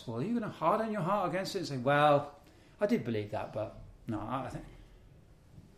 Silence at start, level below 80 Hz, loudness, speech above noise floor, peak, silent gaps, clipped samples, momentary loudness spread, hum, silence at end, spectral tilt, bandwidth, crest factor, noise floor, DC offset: 0 s; -60 dBFS; -33 LUFS; 26 dB; -14 dBFS; none; under 0.1%; 15 LU; none; 0.15 s; -6.5 dB/octave; 15 kHz; 20 dB; -58 dBFS; under 0.1%